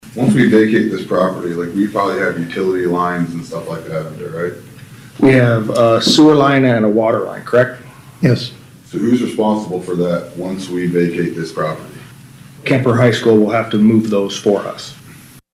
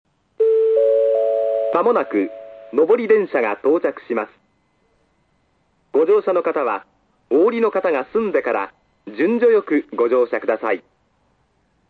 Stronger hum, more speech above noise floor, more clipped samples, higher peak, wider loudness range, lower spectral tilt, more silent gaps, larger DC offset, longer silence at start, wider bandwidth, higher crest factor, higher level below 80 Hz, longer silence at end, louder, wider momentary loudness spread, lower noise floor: neither; second, 26 dB vs 46 dB; neither; about the same, -2 dBFS vs -4 dBFS; first, 7 LU vs 4 LU; second, -6 dB/octave vs -7.5 dB/octave; neither; neither; second, 0.05 s vs 0.4 s; first, 15 kHz vs 4.7 kHz; about the same, 14 dB vs 16 dB; first, -52 dBFS vs -68 dBFS; second, 0.15 s vs 1.1 s; first, -15 LUFS vs -18 LUFS; first, 14 LU vs 9 LU; second, -40 dBFS vs -64 dBFS